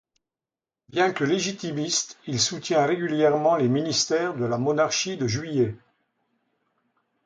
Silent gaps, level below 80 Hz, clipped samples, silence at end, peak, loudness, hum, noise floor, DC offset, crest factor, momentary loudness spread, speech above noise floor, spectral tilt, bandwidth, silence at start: none; -64 dBFS; under 0.1%; 1.5 s; -8 dBFS; -24 LUFS; none; under -90 dBFS; under 0.1%; 18 dB; 6 LU; over 66 dB; -4 dB/octave; 9.6 kHz; 0.95 s